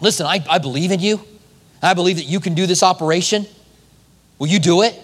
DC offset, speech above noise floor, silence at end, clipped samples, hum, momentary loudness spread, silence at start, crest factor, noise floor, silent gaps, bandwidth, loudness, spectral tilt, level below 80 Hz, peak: under 0.1%; 35 dB; 0 s; under 0.1%; none; 7 LU; 0 s; 18 dB; -51 dBFS; none; 14.5 kHz; -17 LUFS; -4 dB/octave; -60 dBFS; 0 dBFS